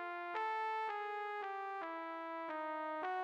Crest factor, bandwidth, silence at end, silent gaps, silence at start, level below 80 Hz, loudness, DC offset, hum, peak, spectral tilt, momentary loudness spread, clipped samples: 14 dB; 9.2 kHz; 0 s; none; 0 s; under -90 dBFS; -42 LUFS; under 0.1%; none; -28 dBFS; -3 dB/octave; 5 LU; under 0.1%